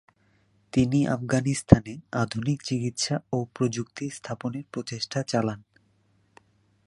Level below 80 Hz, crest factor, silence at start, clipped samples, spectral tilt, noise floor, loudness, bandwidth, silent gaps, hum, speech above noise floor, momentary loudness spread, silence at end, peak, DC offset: -44 dBFS; 26 dB; 0.75 s; under 0.1%; -6 dB/octave; -66 dBFS; -27 LUFS; 11.5 kHz; none; none; 40 dB; 14 LU; 1.25 s; 0 dBFS; under 0.1%